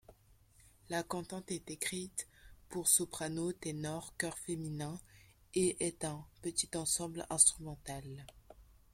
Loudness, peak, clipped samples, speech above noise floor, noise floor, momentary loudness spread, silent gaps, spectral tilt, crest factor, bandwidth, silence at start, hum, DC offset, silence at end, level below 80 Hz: -36 LUFS; -10 dBFS; under 0.1%; 28 dB; -66 dBFS; 17 LU; none; -3 dB/octave; 28 dB; 16.5 kHz; 0.1 s; none; under 0.1%; 0.3 s; -64 dBFS